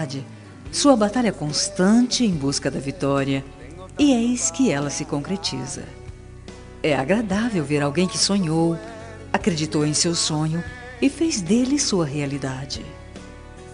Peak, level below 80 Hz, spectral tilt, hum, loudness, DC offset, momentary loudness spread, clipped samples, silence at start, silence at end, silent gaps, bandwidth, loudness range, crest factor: -4 dBFS; -46 dBFS; -4.5 dB/octave; none; -21 LUFS; under 0.1%; 22 LU; under 0.1%; 0 s; 0 s; none; 11 kHz; 3 LU; 20 dB